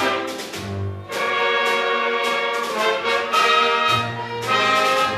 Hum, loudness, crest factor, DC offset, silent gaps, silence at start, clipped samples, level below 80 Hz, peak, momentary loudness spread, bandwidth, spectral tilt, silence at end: none; -19 LUFS; 16 dB; under 0.1%; none; 0 s; under 0.1%; -60 dBFS; -4 dBFS; 12 LU; 15 kHz; -3 dB/octave; 0 s